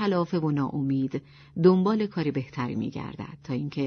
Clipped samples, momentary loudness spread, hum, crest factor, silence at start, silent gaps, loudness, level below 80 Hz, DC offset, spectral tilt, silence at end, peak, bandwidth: under 0.1%; 15 LU; none; 18 dB; 0 s; none; -27 LUFS; -60 dBFS; under 0.1%; -9 dB/octave; 0 s; -8 dBFS; 6.6 kHz